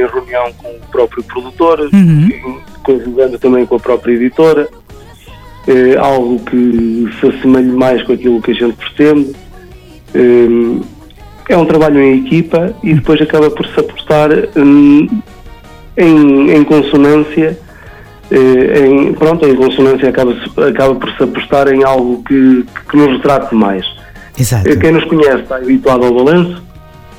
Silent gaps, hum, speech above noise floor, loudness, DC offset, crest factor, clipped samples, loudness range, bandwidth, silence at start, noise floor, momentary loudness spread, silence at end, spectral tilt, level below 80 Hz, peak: none; none; 25 dB; -9 LUFS; under 0.1%; 10 dB; 2%; 3 LU; 16 kHz; 0 s; -34 dBFS; 10 LU; 0.4 s; -7 dB/octave; -36 dBFS; 0 dBFS